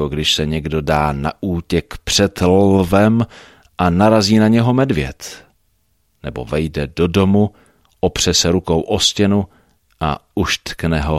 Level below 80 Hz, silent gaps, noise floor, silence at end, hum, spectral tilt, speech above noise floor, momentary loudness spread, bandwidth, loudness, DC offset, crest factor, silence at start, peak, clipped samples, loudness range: -34 dBFS; none; -63 dBFS; 0 s; none; -5 dB/octave; 47 dB; 11 LU; 14.5 kHz; -16 LUFS; under 0.1%; 16 dB; 0 s; 0 dBFS; under 0.1%; 4 LU